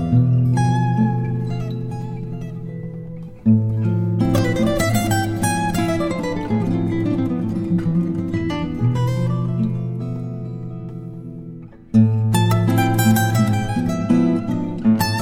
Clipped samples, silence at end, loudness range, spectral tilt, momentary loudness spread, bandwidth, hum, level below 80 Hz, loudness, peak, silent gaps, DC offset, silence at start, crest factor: under 0.1%; 0 s; 5 LU; -6.5 dB/octave; 14 LU; 16.5 kHz; none; -40 dBFS; -20 LUFS; -4 dBFS; none; under 0.1%; 0 s; 16 dB